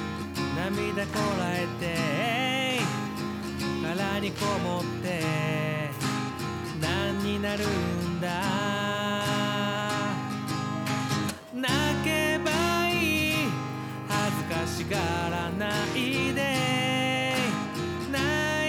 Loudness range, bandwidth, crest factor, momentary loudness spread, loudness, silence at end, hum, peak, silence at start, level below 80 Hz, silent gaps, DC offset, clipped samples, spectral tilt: 3 LU; 18.5 kHz; 12 dB; 6 LU; -28 LUFS; 0 s; none; -16 dBFS; 0 s; -58 dBFS; none; under 0.1%; under 0.1%; -4.5 dB/octave